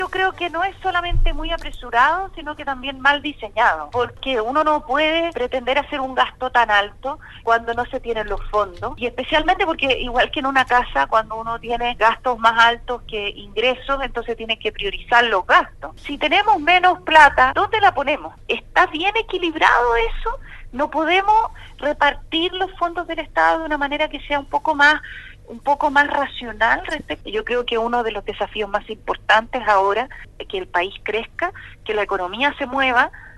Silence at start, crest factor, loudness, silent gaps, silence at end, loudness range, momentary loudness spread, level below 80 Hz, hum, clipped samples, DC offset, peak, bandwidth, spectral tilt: 0 s; 20 dB; -19 LUFS; none; 0 s; 5 LU; 12 LU; -34 dBFS; 50 Hz at -50 dBFS; under 0.1%; under 0.1%; 0 dBFS; 12 kHz; -4 dB/octave